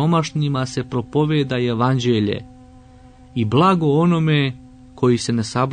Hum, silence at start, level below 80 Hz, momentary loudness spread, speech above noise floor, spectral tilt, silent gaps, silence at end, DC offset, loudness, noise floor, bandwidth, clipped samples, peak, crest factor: none; 0 s; -50 dBFS; 9 LU; 27 dB; -6.5 dB/octave; none; 0 s; under 0.1%; -19 LUFS; -45 dBFS; 9.6 kHz; under 0.1%; -4 dBFS; 14 dB